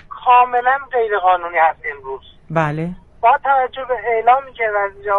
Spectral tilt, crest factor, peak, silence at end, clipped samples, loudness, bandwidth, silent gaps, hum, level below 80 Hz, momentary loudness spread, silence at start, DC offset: -7 dB/octave; 16 dB; 0 dBFS; 0 s; under 0.1%; -16 LUFS; 6.6 kHz; none; none; -48 dBFS; 13 LU; 0.1 s; under 0.1%